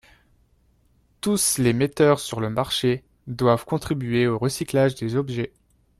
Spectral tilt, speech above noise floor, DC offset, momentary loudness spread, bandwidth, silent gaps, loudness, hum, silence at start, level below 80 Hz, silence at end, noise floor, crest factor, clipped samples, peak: -5 dB/octave; 40 dB; under 0.1%; 10 LU; 15 kHz; none; -22 LUFS; none; 1.25 s; -52 dBFS; 0.5 s; -62 dBFS; 18 dB; under 0.1%; -6 dBFS